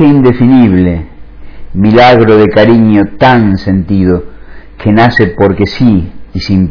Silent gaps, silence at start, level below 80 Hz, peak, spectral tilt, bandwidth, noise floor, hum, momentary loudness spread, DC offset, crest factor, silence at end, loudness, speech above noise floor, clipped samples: none; 0 s; -28 dBFS; 0 dBFS; -8.5 dB/octave; 5.4 kHz; -27 dBFS; none; 9 LU; under 0.1%; 6 dB; 0 s; -7 LUFS; 21 dB; 5%